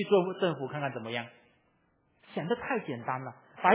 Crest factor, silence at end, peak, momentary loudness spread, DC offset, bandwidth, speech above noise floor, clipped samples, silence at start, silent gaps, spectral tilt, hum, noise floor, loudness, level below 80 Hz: 24 dB; 0 s; -8 dBFS; 12 LU; under 0.1%; 4 kHz; 39 dB; under 0.1%; 0 s; none; -4 dB/octave; none; -71 dBFS; -33 LUFS; -74 dBFS